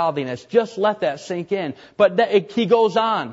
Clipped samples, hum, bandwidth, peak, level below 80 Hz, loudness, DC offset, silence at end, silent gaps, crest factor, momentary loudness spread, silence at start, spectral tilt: under 0.1%; none; 8 kHz; -4 dBFS; -66 dBFS; -20 LUFS; under 0.1%; 0 s; none; 16 dB; 9 LU; 0 s; -6 dB/octave